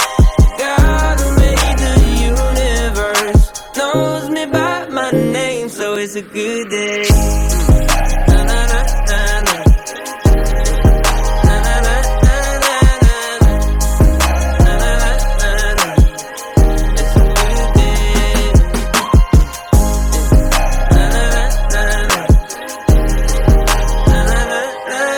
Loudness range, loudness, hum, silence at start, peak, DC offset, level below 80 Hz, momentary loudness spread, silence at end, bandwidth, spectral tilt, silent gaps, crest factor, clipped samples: 2 LU; -14 LUFS; none; 0 s; -2 dBFS; under 0.1%; -14 dBFS; 5 LU; 0 s; 18.5 kHz; -5 dB/octave; none; 10 dB; under 0.1%